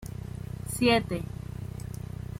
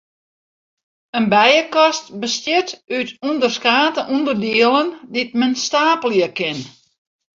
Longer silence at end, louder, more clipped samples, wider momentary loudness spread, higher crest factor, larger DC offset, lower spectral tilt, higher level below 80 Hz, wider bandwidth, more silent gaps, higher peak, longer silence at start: second, 0 s vs 0.7 s; second, -31 LUFS vs -17 LUFS; neither; first, 15 LU vs 10 LU; about the same, 20 dB vs 18 dB; neither; first, -5 dB/octave vs -3 dB/octave; first, -46 dBFS vs -64 dBFS; first, 16.5 kHz vs 7.6 kHz; neither; second, -10 dBFS vs -2 dBFS; second, 0 s vs 1.15 s